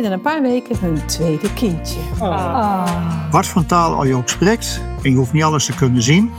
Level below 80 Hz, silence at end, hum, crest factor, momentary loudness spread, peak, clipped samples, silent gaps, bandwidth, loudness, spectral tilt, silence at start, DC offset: -32 dBFS; 0 s; none; 14 dB; 6 LU; -2 dBFS; under 0.1%; none; 16.5 kHz; -17 LUFS; -5.5 dB/octave; 0 s; under 0.1%